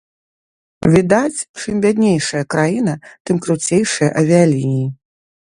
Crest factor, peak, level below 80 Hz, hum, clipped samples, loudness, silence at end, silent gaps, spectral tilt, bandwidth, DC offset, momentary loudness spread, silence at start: 16 dB; 0 dBFS; -48 dBFS; none; under 0.1%; -16 LUFS; 0.55 s; 1.49-1.54 s, 3.20-3.25 s; -5.5 dB/octave; 11.5 kHz; under 0.1%; 9 LU; 0.85 s